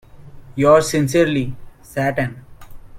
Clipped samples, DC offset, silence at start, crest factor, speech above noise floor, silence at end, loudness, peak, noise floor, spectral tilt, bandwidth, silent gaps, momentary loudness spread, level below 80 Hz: under 0.1%; under 0.1%; 0.15 s; 18 dB; 22 dB; 0 s; -17 LUFS; 0 dBFS; -38 dBFS; -5.5 dB/octave; 16.5 kHz; none; 16 LU; -44 dBFS